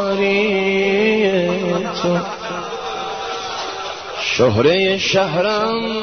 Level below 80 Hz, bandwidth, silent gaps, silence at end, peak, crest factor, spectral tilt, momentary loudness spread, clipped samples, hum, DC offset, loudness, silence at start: -52 dBFS; 6.6 kHz; none; 0 s; -2 dBFS; 16 dB; -5 dB/octave; 11 LU; under 0.1%; none; 0.3%; -18 LUFS; 0 s